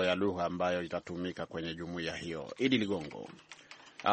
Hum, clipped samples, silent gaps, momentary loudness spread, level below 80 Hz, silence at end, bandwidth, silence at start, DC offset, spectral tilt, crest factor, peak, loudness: none; under 0.1%; none; 19 LU; -64 dBFS; 0 s; 8.4 kHz; 0 s; under 0.1%; -5.5 dB/octave; 22 dB; -12 dBFS; -35 LUFS